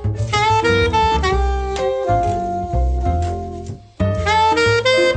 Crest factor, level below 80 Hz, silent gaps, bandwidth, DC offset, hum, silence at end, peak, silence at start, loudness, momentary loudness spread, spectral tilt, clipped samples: 14 dB; -26 dBFS; none; 9.4 kHz; under 0.1%; none; 0 s; -4 dBFS; 0 s; -17 LUFS; 9 LU; -5 dB/octave; under 0.1%